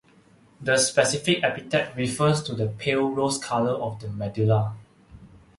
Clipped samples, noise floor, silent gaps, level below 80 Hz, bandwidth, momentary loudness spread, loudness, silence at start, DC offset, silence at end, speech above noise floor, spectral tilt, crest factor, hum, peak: under 0.1%; -56 dBFS; none; -56 dBFS; 11.5 kHz; 11 LU; -24 LUFS; 0.6 s; under 0.1%; 0.2 s; 32 dB; -4.5 dB/octave; 20 dB; none; -4 dBFS